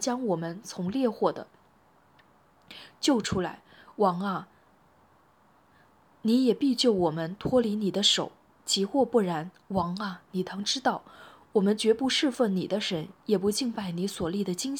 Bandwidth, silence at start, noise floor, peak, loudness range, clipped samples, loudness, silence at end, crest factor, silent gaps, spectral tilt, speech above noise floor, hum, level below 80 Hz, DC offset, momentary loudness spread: 18.5 kHz; 0 s; -62 dBFS; -10 dBFS; 5 LU; under 0.1%; -28 LUFS; 0 s; 18 dB; none; -4.5 dB/octave; 35 dB; none; -62 dBFS; under 0.1%; 11 LU